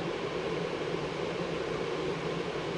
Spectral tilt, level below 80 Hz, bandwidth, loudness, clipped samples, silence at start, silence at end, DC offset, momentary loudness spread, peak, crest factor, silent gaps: -5.5 dB/octave; -56 dBFS; 11.5 kHz; -34 LUFS; under 0.1%; 0 s; 0 s; under 0.1%; 1 LU; -20 dBFS; 14 dB; none